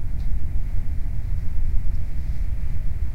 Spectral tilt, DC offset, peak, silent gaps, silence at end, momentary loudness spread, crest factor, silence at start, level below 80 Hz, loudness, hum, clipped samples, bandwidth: -8 dB/octave; 7%; -6 dBFS; none; 0 s; 2 LU; 12 dB; 0 s; -22 dBFS; -30 LUFS; none; under 0.1%; 2.5 kHz